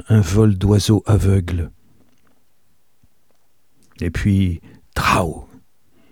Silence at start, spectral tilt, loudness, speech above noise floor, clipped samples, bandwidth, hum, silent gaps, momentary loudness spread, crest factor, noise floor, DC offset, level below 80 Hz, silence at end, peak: 0.1 s; -6.5 dB/octave; -18 LUFS; 50 dB; under 0.1%; 16.5 kHz; none; none; 14 LU; 18 dB; -66 dBFS; 0.3%; -34 dBFS; 0.65 s; -2 dBFS